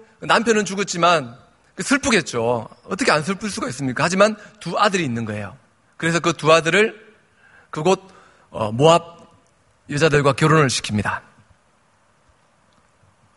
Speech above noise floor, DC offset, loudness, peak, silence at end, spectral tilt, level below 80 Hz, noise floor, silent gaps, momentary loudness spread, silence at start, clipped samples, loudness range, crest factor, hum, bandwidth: 41 dB; under 0.1%; -19 LUFS; 0 dBFS; 2.2 s; -4.5 dB/octave; -54 dBFS; -60 dBFS; none; 13 LU; 0.2 s; under 0.1%; 2 LU; 20 dB; none; 11.5 kHz